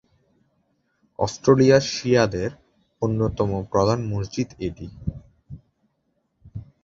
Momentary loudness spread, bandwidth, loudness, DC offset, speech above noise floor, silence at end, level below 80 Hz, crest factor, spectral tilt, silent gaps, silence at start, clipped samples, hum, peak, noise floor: 17 LU; 7.8 kHz; -22 LUFS; under 0.1%; 51 dB; 0.2 s; -46 dBFS; 20 dB; -6 dB/octave; none; 1.2 s; under 0.1%; none; -4 dBFS; -72 dBFS